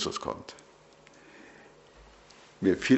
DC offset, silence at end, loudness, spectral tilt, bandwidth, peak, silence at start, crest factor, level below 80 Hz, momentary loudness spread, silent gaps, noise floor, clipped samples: under 0.1%; 0 s; -32 LUFS; -5 dB/octave; 8.2 kHz; -10 dBFS; 0 s; 22 dB; -62 dBFS; 26 LU; none; -57 dBFS; under 0.1%